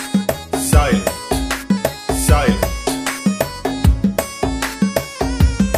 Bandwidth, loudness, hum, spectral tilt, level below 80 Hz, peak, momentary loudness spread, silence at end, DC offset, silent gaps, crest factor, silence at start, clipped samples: 16 kHz; -18 LUFS; none; -5 dB/octave; -22 dBFS; 0 dBFS; 7 LU; 0 s; under 0.1%; none; 16 dB; 0 s; under 0.1%